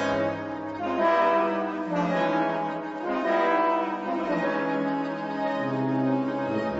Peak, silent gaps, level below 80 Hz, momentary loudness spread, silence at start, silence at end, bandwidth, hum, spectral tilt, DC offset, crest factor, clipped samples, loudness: -12 dBFS; none; -64 dBFS; 7 LU; 0 s; 0 s; 8 kHz; none; -7 dB/octave; under 0.1%; 14 dB; under 0.1%; -26 LUFS